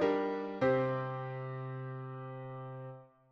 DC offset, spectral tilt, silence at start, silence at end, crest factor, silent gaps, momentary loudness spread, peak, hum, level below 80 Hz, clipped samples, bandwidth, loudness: under 0.1%; -8.5 dB/octave; 0 s; 0.25 s; 18 dB; none; 15 LU; -20 dBFS; none; -72 dBFS; under 0.1%; 6.4 kHz; -37 LUFS